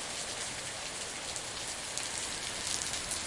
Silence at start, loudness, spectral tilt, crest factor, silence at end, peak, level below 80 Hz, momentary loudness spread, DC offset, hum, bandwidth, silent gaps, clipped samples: 0 s; -35 LUFS; -0.5 dB/octave; 28 dB; 0 s; -10 dBFS; -58 dBFS; 4 LU; under 0.1%; none; 11.5 kHz; none; under 0.1%